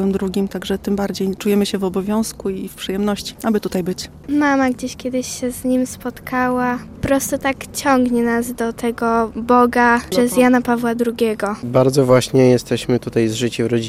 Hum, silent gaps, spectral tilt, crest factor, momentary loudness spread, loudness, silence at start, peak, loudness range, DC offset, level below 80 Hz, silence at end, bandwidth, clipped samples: none; none; -5.5 dB/octave; 16 dB; 9 LU; -18 LUFS; 0 s; -2 dBFS; 5 LU; under 0.1%; -44 dBFS; 0 s; 16 kHz; under 0.1%